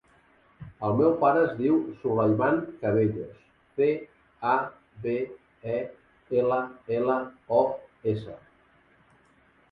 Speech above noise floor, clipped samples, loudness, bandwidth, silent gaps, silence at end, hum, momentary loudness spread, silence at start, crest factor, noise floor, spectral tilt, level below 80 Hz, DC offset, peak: 36 dB; under 0.1%; -27 LUFS; 5 kHz; none; 1.35 s; none; 14 LU; 0.6 s; 20 dB; -62 dBFS; -10.5 dB/octave; -62 dBFS; under 0.1%; -8 dBFS